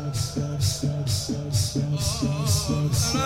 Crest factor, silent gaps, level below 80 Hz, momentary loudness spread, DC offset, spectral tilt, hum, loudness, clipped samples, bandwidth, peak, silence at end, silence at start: 14 dB; none; -42 dBFS; 4 LU; under 0.1%; -4.5 dB/octave; none; -25 LUFS; under 0.1%; 16.5 kHz; -10 dBFS; 0 s; 0 s